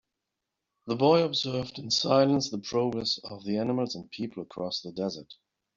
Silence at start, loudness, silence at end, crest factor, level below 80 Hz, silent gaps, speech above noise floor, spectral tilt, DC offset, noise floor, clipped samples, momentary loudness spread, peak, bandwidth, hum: 0.85 s; -28 LUFS; 0.45 s; 20 dB; -66 dBFS; none; 57 dB; -5 dB/octave; under 0.1%; -85 dBFS; under 0.1%; 14 LU; -10 dBFS; 7.6 kHz; none